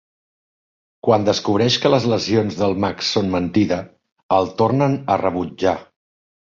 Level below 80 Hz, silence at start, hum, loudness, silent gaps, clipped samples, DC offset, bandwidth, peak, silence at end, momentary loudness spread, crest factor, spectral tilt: -48 dBFS; 1.05 s; none; -19 LUFS; 4.12-4.16 s, 4.23-4.29 s; under 0.1%; under 0.1%; 7.6 kHz; -2 dBFS; 0.7 s; 5 LU; 18 dB; -5.5 dB/octave